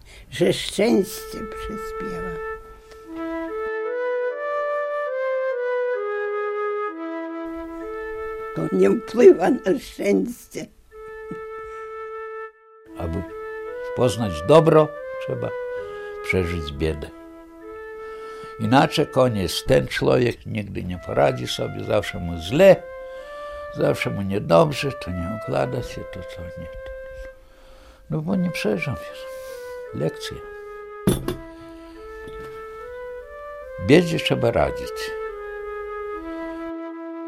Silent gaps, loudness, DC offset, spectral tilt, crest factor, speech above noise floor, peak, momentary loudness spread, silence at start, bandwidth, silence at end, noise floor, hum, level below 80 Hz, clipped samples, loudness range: none; -23 LUFS; under 0.1%; -6 dB/octave; 22 dB; 26 dB; -2 dBFS; 19 LU; 0.05 s; 16 kHz; 0 s; -47 dBFS; none; -46 dBFS; under 0.1%; 9 LU